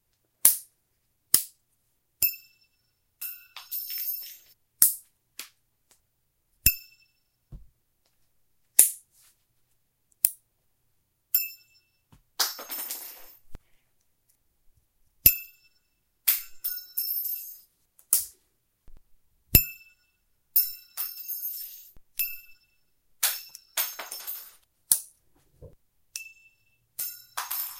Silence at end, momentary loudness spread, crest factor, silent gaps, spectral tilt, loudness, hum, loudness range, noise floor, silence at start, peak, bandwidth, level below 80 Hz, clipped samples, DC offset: 0 s; 22 LU; 32 dB; none; -0.5 dB/octave; -26 LUFS; none; 6 LU; -74 dBFS; 0.45 s; 0 dBFS; 16.5 kHz; -50 dBFS; under 0.1%; under 0.1%